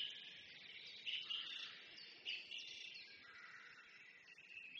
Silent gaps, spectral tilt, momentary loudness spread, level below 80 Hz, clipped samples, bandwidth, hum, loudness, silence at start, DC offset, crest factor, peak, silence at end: none; 0.5 dB/octave; 14 LU; under -90 dBFS; under 0.1%; 8.4 kHz; none; -50 LUFS; 0 s; under 0.1%; 20 dB; -34 dBFS; 0 s